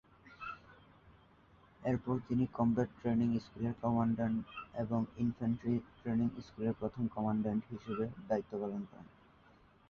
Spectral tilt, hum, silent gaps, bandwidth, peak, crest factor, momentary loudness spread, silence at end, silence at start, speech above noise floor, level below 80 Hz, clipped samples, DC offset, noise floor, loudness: -8.5 dB/octave; none; none; 6.8 kHz; -20 dBFS; 16 dB; 12 LU; 0.8 s; 0.25 s; 29 dB; -62 dBFS; under 0.1%; under 0.1%; -65 dBFS; -37 LUFS